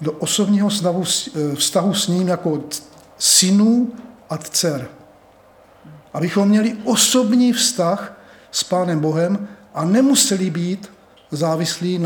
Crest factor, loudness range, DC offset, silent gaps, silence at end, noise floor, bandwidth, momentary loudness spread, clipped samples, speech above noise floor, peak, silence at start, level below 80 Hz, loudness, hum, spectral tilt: 16 dB; 2 LU; under 0.1%; none; 0 s; -49 dBFS; over 20 kHz; 15 LU; under 0.1%; 31 dB; -2 dBFS; 0 s; -64 dBFS; -17 LUFS; none; -4 dB/octave